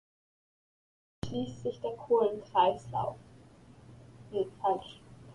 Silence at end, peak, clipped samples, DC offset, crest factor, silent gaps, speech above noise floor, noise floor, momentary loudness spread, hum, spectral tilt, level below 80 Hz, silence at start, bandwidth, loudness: 0 s; -14 dBFS; under 0.1%; under 0.1%; 20 dB; none; 24 dB; -56 dBFS; 15 LU; none; -6.5 dB/octave; -62 dBFS; 1.25 s; 11 kHz; -32 LUFS